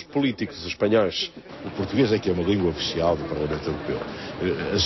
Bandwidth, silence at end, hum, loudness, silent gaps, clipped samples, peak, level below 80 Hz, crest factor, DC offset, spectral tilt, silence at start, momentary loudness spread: 6.2 kHz; 0 s; none; -25 LUFS; none; under 0.1%; -8 dBFS; -44 dBFS; 16 dB; under 0.1%; -5.5 dB/octave; 0 s; 9 LU